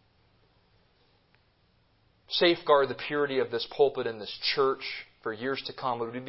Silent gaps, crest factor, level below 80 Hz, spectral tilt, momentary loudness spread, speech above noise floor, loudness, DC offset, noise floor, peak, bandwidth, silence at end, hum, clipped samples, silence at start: none; 22 dB; -70 dBFS; -8 dB/octave; 10 LU; 39 dB; -28 LUFS; under 0.1%; -67 dBFS; -8 dBFS; 5.8 kHz; 0 s; none; under 0.1%; 2.3 s